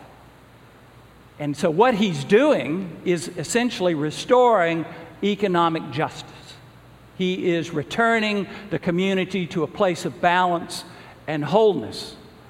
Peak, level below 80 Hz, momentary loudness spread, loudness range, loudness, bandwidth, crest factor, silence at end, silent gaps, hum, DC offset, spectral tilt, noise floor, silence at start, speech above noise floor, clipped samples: -2 dBFS; -58 dBFS; 14 LU; 4 LU; -22 LUFS; 16 kHz; 20 dB; 0.2 s; none; none; under 0.1%; -5.5 dB/octave; -49 dBFS; 0 s; 27 dB; under 0.1%